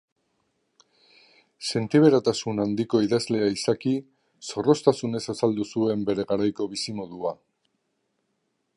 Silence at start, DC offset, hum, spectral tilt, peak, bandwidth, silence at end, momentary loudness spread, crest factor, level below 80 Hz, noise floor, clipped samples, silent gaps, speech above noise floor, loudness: 1.6 s; under 0.1%; none; -5.5 dB/octave; -4 dBFS; 11.5 kHz; 1.4 s; 13 LU; 22 dB; -64 dBFS; -75 dBFS; under 0.1%; none; 51 dB; -25 LUFS